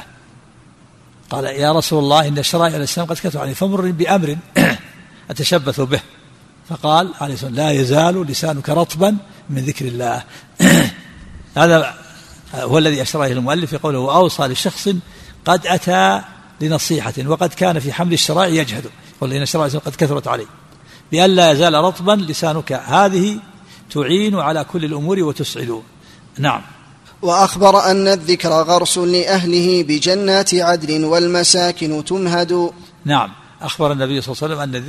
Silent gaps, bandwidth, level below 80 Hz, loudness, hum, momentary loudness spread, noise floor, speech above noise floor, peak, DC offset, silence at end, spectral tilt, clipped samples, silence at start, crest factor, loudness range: none; 13.5 kHz; -50 dBFS; -16 LUFS; none; 12 LU; -46 dBFS; 31 dB; 0 dBFS; under 0.1%; 0 s; -4.5 dB/octave; under 0.1%; 0 s; 16 dB; 4 LU